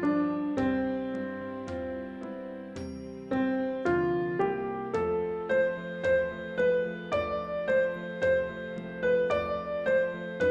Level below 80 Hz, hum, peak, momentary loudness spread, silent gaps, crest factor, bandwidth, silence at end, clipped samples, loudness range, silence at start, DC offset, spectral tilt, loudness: -58 dBFS; none; -14 dBFS; 11 LU; none; 14 dB; 8 kHz; 0 s; under 0.1%; 4 LU; 0 s; under 0.1%; -7.5 dB/octave; -30 LUFS